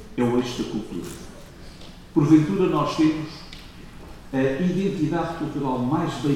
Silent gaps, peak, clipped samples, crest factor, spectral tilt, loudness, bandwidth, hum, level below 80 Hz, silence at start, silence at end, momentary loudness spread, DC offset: none; -4 dBFS; under 0.1%; 20 dB; -7 dB/octave; -23 LUFS; 13.5 kHz; none; -46 dBFS; 0 s; 0 s; 25 LU; under 0.1%